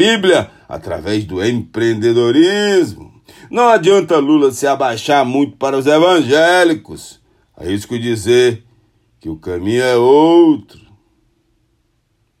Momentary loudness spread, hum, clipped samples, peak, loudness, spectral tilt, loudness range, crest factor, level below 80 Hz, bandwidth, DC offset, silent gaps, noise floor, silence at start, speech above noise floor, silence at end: 15 LU; none; under 0.1%; 0 dBFS; -13 LUFS; -5 dB/octave; 3 LU; 14 dB; -52 dBFS; 14.5 kHz; under 0.1%; none; -62 dBFS; 0 s; 49 dB; 1.8 s